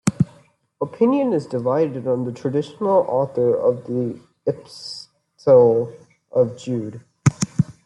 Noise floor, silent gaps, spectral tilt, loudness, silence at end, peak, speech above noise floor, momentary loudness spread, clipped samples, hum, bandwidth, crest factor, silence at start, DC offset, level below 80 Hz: -54 dBFS; none; -7 dB/octave; -20 LUFS; 0.15 s; 0 dBFS; 34 dB; 14 LU; under 0.1%; none; 12 kHz; 20 dB; 0.05 s; under 0.1%; -58 dBFS